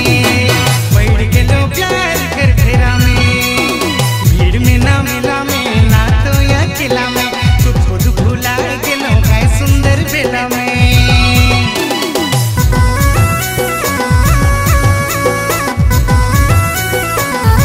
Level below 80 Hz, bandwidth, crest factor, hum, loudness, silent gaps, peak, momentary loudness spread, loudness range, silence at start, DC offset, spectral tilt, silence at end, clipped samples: -16 dBFS; 16.5 kHz; 10 dB; none; -11 LUFS; none; 0 dBFS; 4 LU; 1 LU; 0 s; under 0.1%; -5 dB/octave; 0 s; under 0.1%